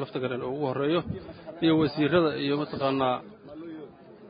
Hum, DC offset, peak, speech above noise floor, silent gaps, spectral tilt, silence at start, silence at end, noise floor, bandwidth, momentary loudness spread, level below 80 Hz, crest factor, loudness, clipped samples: none; under 0.1%; -10 dBFS; 20 dB; none; -10.5 dB/octave; 0 s; 0 s; -47 dBFS; 5.2 kHz; 19 LU; -58 dBFS; 18 dB; -27 LUFS; under 0.1%